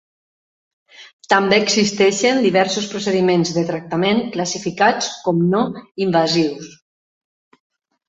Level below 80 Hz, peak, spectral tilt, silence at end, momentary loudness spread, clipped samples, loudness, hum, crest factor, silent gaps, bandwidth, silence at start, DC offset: -60 dBFS; 0 dBFS; -4.5 dB/octave; 1.4 s; 8 LU; under 0.1%; -17 LUFS; none; 18 dB; 1.13-1.19 s; 8.2 kHz; 1 s; under 0.1%